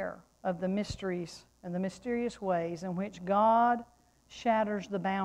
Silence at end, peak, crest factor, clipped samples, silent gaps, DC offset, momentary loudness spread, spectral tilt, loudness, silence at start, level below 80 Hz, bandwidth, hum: 0 s; -16 dBFS; 16 dB; under 0.1%; none; under 0.1%; 13 LU; -6.5 dB/octave; -32 LUFS; 0 s; -60 dBFS; 11.5 kHz; none